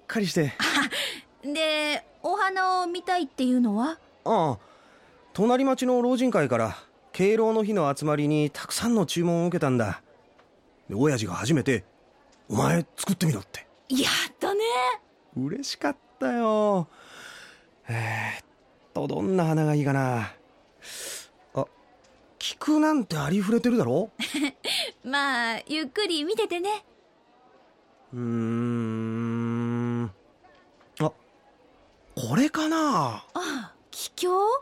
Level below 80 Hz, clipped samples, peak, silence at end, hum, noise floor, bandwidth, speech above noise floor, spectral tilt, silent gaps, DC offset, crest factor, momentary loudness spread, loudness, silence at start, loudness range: -64 dBFS; under 0.1%; -10 dBFS; 0 s; none; -60 dBFS; 16.5 kHz; 35 dB; -5 dB/octave; none; under 0.1%; 16 dB; 13 LU; -26 LUFS; 0.1 s; 6 LU